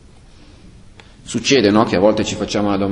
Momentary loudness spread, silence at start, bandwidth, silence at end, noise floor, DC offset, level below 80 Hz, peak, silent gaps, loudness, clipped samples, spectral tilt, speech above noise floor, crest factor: 8 LU; 0.65 s; 11 kHz; 0 s; -43 dBFS; under 0.1%; -42 dBFS; 0 dBFS; none; -16 LUFS; under 0.1%; -4.5 dB/octave; 28 dB; 18 dB